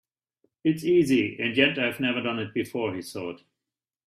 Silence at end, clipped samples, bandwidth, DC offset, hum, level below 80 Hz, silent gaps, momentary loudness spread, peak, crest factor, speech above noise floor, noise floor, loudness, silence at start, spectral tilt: 0.7 s; under 0.1%; 14.5 kHz; under 0.1%; none; -66 dBFS; none; 13 LU; -6 dBFS; 22 dB; 64 dB; -89 dBFS; -25 LUFS; 0.65 s; -5.5 dB/octave